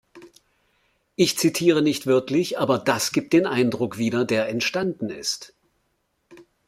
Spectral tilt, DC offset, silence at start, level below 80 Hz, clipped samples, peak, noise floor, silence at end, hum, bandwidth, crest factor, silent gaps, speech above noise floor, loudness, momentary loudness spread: -4.5 dB/octave; under 0.1%; 0.15 s; -64 dBFS; under 0.1%; -4 dBFS; -71 dBFS; 0.25 s; none; 16 kHz; 20 dB; none; 50 dB; -22 LUFS; 8 LU